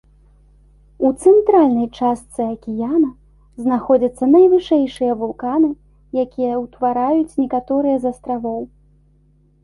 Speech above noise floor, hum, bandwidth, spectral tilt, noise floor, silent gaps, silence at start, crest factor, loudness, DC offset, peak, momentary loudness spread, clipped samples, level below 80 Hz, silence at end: 38 dB; 50 Hz at -45 dBFS; 11.5 kHz; -7 dB/octave; -54 dBFS; none; 1 s; 16 dB; -17 LUFS; under 0.1%; -2 dBFS; 12 LU; under 0.1%; -50 dBFS; 0.95 s